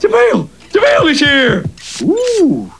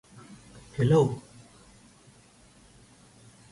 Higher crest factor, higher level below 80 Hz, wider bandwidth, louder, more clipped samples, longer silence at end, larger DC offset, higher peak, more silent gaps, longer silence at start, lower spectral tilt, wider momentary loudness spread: second, 12 dB vs 20 dB; first, -42 dBFS vs -58 dBFS; about the same, 11 kHz vs 11.5 kHz; first, -11 LUFS vs -26 LUFS; neither; second, 0.1 s vs 2.3 s; first, 0.5% vs under 0.1%; first, 0 dBFS vs -12 dBFS; neither; second, 0 s vs 0.3 s; second, -4.5 dB/octave vs -7.5 dB/octave; second, 9 LU vs 27 LU